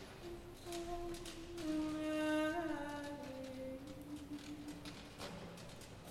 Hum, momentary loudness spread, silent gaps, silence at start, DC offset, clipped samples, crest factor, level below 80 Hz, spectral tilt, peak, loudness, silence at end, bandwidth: none; 14 LU; none; 0 s; under 0.1%; under 0.1%; 18 dB; -60 dBFS; -5 dB/octave; -28 dBFS; -45 LUFS; 0 s; 16 kHz